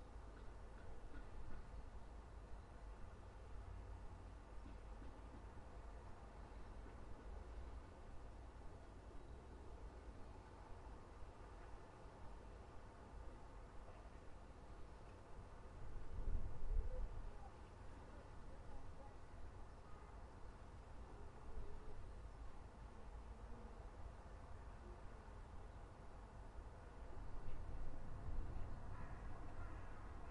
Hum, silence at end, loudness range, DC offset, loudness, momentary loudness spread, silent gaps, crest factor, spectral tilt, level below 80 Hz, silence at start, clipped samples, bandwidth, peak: none; 0 s; 6 LU; under 0.1%; -58 LUFS; 7 LU; none; 20 dB; -7 dB/octave; -54 dBFS; 0 s; under 0.1%; 10.5 kHz; -30 dBFS